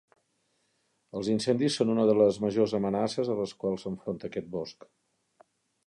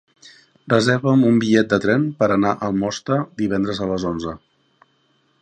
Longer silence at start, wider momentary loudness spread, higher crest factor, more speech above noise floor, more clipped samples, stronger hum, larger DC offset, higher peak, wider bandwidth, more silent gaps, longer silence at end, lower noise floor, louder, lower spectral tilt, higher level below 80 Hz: first, 1.15 s vs 0.25 s; first, 12 LU vs 8 LU; about the same, 20 dB vs 18 dB; about the same, 46 dB vs 45 dB; neither; neither; neither; second, -10 dBFS vs -2 dBFS; first, 11.5 kHz vs 9.6 kHz; neither; about the same, 1.15 s vs 1.05 s; first, -74 dBFS vs -63 dBFS; second, -28 LUFS vs -19 LUFS; about the same, -6 dB/octave vs -6.5 dB/octave; second, -66 dBFS vs -50 dBFS